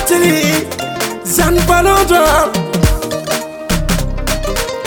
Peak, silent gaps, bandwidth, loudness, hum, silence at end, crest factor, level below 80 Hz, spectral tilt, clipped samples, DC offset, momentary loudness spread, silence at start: 0 dBFS; none; over 20 kHz; -13 LUFS; none; 0 s; 14 dB; -22 dBFS; -4 dB/octave; under 0.1%; under 0.1%; 9 LU; 0 s